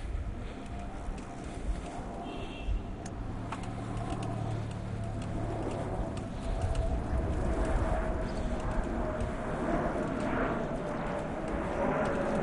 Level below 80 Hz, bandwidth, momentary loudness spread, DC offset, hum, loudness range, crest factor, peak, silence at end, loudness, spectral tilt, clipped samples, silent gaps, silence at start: -38 dBFS; 11 kHz; 9 LU; under 0.1%; none; 6 LU; 16 dB; -18 dBFS; 0 s; -35 LUFS; -7 dB/octave; under 0.1%; none; 0 s